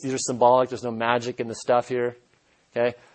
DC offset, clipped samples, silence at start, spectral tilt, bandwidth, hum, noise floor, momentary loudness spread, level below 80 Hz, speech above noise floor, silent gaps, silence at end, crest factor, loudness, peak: under 0.1%; under 0.1%; 0 s; -4.5 dB/octave; 8.8 kHz; none; -63 dBFS; 12 LU; -68 dBFS; 39 dB; none; 0.2 s; 20 dB; -24 LUFS; -6 dBFS